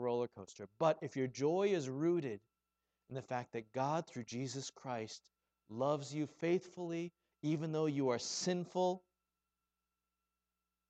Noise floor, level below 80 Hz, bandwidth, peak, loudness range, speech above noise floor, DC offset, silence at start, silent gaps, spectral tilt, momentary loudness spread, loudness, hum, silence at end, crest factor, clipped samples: under -90 dBFS; -84 dBFS; 9 kHz; -20 dBFS; 4 LU; over 52 dB; under 0.1%; 0 s; none; -5.5 dB/octave; 13 LU; -39 LUFS; none; 1.9 s; 20 dB; under 0.1%